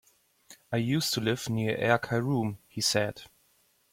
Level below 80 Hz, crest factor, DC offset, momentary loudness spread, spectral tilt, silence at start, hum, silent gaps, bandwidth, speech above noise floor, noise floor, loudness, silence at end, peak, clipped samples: -64 dBFS; 22 dB; under 0.1%; 8 LU; -4.5 dB/octave; 0.5 s; none; none; 16.5 kHz; 39 dB; -68 dBFS; -29 LUFS; 0.65 s; -8 dBFS; under 0.1%